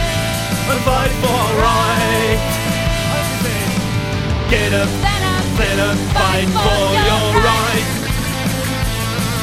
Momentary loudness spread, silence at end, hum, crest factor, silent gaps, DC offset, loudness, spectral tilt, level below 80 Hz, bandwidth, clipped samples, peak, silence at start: 5 LU; 0 s; none; 16 dB; none; under 0.1%; -16 LUFS; -4.5 dB/octave; -26 dBFS; 16.5 kHz; under 0.1%; 0 dBFS; 0 s